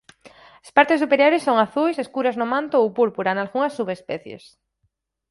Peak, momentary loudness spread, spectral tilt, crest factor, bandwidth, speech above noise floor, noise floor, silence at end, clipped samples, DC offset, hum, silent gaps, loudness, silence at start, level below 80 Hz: 0 dBFS; 12 LU; -5.5 dB/octave; 22 dB; 11.5 kHz; 52 dB; -72 dBFS; 0.95 s; under 0.1%; under 0.1%; none; none; -20 LUFS; 0.25 s; -68 dBFS